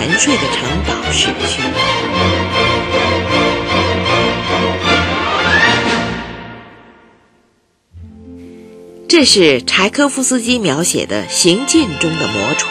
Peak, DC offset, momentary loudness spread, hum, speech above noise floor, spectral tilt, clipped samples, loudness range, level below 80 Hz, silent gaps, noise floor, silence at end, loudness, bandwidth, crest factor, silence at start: 0 dBFS; under 0.1%; 6 LU; none; 44 dB; -3 dB/octave; under 0.1%; 5 LU; -36 dBFS; none; -58 dBFS; 0 s; -13 LUFS; 13 kHz; 14 dB; 0 s